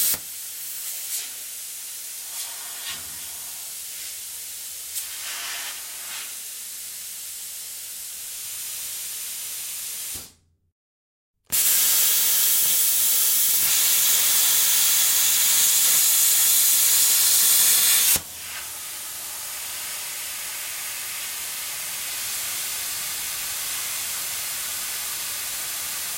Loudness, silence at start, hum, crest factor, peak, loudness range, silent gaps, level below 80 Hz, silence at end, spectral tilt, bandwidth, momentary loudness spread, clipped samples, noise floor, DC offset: -20 LUFS; 0 s; none; 18 dB; -6 dBFS; 15 LU; 10.72-11.34 s; -64 dBFS; 0 s; 2.5 dB/octave; 16.5 kHz; 17 LU; under 0.1%; -51 dBFS; under 0.1%